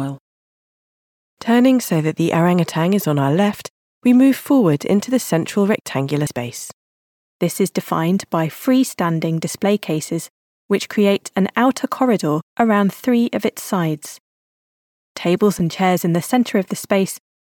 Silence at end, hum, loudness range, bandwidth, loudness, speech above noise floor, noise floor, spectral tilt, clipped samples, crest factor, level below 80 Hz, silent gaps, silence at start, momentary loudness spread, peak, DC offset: 0.3 s; none; 4 LU; 18 kHz; -18 LUFS; over 73 dB; under -90 dBFS; -6 dB/octave; under 0.1%; 16 dB; -62 dBFS; 0.20-1.37 s, 3.70-4.02 s, 5.81-5.85 s, 6.73-7.40 s, 10.30-10.69 s, 12.42-12.57 s, 14.20-15.15 s; 0 s; 9 LU; -2 dBFS; under 0.1%